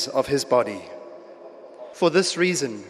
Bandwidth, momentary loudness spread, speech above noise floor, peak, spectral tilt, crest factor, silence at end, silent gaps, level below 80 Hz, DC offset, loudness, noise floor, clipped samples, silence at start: 14 kHz; 23 LU; 21 dB; -6 dBFS; -4 dB/octave; 18 dB; 0 s; none; -62 dBFS; under 0.1%; -22 LUFS; -43 dBFS; under 0.1%; 0 s